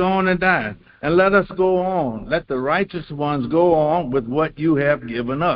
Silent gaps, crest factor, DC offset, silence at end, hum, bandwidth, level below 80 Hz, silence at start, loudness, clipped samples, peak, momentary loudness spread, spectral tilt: none; 16 dB; under 0.1%; 0 s; none; 5.4 kHz; -46 dBFS; 0 s; -19 LUFS; under 0.1%; -2 dBFS; 8 LU; -11.5 dB/octave